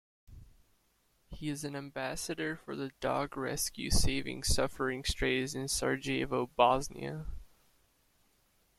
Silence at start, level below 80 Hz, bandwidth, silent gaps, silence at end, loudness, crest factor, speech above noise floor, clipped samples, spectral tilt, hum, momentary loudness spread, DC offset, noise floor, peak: 0.3 s; -44 dBFS; 14 kHz; none; 1.3 s; -34 LUFS; 24 dB; 40 dB; under 0.1%; -3.5 dB/octave; none; 13 LU; under 0.1%; -73 dBFS; -10 dBFS